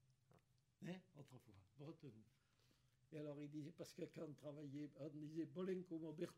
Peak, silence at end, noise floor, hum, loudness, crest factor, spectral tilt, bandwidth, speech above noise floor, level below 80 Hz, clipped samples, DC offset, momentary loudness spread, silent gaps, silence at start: -36 dBFS; 0 s; -80 dBFS; none; -54 LUFS; 18 dB; -7 dB/octave; 15.5 kHz; 27 dB; under -90 dBFS; under 0.1%; under 0.1%; 14 LU; none; 0.1 s